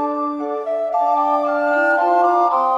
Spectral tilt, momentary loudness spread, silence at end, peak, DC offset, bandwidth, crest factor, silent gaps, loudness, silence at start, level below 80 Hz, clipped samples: -4 dB/octave; 7 LU; 0 s; -6 dBFS; under 0.1%; 7.6 kHz; 12 dB; none; -18 LUFS; 0 s; -66 dBFS; under 0.1%